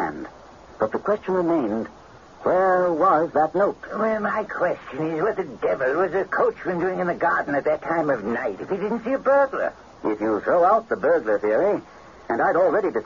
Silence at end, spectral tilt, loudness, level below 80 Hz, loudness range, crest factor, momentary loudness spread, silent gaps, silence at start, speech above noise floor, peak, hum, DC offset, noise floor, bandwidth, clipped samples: 0 s; -7.5 dB/octave; -22 LUFS; -56 dBFS; 2 LU; 14 dB; 9 LU; none; 0 s; 23 dB; -8 dBFS; none; under 0.1%; -45 dBFS; 7.2 kHz; under 0.1%